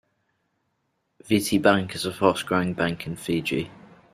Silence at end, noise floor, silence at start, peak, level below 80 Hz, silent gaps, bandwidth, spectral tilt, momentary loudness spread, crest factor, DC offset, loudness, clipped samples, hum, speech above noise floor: 0.35 s; -74 dBFS; 1.25 s; -2 dBFS; -58 dBFS; none; 16 kHz; -5 dB/octave; 10 LU; 24 dB; under 0.1%; -24 LUFS; under 0.1%; none; 51 dB